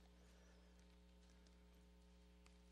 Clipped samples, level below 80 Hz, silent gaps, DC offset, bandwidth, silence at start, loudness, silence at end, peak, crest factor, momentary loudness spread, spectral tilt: under 0.1%; -70 dBFS; none; under 0.1%; 12 kHz; 0 s; -70 LUFS; 0 s; -50 dBFS; 18 dB; 1 LU; -5 dB/octave